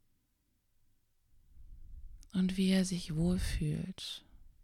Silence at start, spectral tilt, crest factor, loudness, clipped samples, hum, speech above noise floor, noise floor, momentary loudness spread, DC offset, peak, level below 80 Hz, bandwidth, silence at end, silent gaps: 1.55 s; -6 dB/octave; 18 dB; -34 LUFS; under 0.1%; none; 44 dB; -77 dBFS; 12 LU; under 0.1%; -18 dBFS; -48 dBFS; 14 kHz; 0.15 s; none